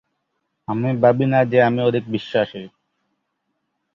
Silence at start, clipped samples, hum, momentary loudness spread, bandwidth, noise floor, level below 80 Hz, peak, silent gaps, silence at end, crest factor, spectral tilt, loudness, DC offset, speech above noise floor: 0.7 s; under 0.1%; none; 12 LU; 7 kHz; -74 dBFS; -60 dBFS; -2 dBFS; none; 1.25 s; 18 dB; -9 dB/octave; -19 LUFS; under 0.1%; 56 dB